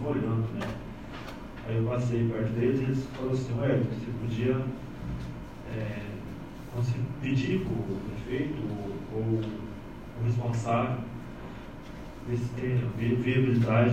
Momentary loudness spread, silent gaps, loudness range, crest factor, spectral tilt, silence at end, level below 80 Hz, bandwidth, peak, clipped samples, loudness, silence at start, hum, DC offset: 14 LU; none; 4 LU; 18 dB; -8 dB/octave; 0 s; -48 dBFS; 8.8 kHz; -12 dBFS; under 0.1%; -31 LUFS; 0 s; none; under 0.1%